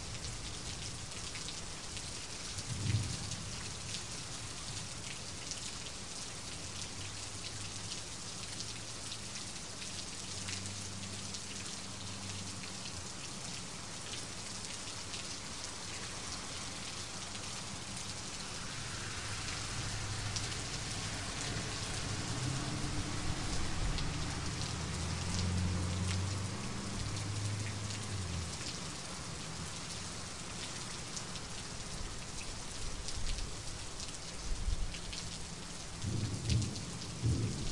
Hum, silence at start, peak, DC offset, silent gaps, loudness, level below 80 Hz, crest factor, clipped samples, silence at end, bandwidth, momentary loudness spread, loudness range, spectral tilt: none; 0 s; -18 dBFS; 0.3%; none; -40 LUFS; -48 dBFS; 22 dB; under 0.1%; 0 s; 11.5 kHz; 6 LU; 4 LU; -3 dB/octave